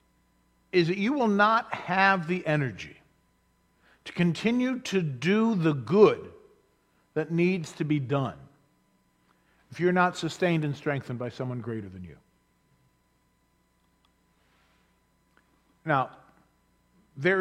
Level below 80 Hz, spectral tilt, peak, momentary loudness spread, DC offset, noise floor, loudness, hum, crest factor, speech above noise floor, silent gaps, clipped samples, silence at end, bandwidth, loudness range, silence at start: -68 dBFS; -6.5 dB/octave; -6 dBFS; 15 LU; under 0.1%; -69 dBFS; -27 LUFS; none; 22 dB; 43 dB; none; under 0.1%; 0 s; 11.5 kHz; 10 LU; 0.75 s